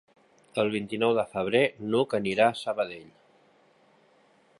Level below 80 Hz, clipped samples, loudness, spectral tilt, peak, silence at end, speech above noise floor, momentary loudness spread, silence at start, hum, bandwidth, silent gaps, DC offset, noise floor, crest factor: -68 dBFS; under 0.1%; -27 LUFS; -5.5 dB/octave; -8 dBFS; 1.55 s; 36 dB; 8 LU; 0.55 s; none; 11.5 kHz; none; under 0.1%; -62 dBFS; 22 dB